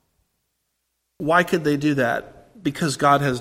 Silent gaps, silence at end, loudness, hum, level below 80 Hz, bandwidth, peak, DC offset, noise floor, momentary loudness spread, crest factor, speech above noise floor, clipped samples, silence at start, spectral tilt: none; 0 s; -21 LUFS; none; -56 dBFS; 16.5 kHz; -2 dBFS; under 0.1%; -75 dBFS; 11 LU; 20 dB; 55 dB; under 0.1%; 1.2 s; -5.5 dB/octave